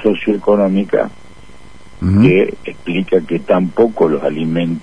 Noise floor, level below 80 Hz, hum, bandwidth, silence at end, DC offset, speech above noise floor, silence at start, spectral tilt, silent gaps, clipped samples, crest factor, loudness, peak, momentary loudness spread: -41 dBFS; -42 dBFS; none; 10 kHz; 0 s; 2%; 27 dB; 0 s; -8.5 dB/octave; none; under 0.1%; 14 dB; -15 LUFS; 0 dBFS; 9 LU